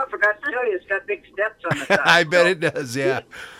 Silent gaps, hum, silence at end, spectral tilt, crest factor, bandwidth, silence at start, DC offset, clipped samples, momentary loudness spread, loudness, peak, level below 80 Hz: none; none; 0 s; -4 dB/octave; 20 dB; 16 kHz; 0 s; under 0.1%; under 0.1%; 11 LU; -20 LUFS; 0 dBFS; -60 dBFS